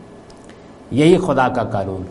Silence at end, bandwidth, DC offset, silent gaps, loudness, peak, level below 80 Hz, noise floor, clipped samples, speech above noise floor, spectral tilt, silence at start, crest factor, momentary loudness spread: 0 s; 11.5 kHz; under 0.1%; none; -16 LUFS; -2 dBFS; -44 dBFS; -40 dBFS; under 0.1%; 24 dB; -7 dB/octave; 0 s; 16 dB; 10 LU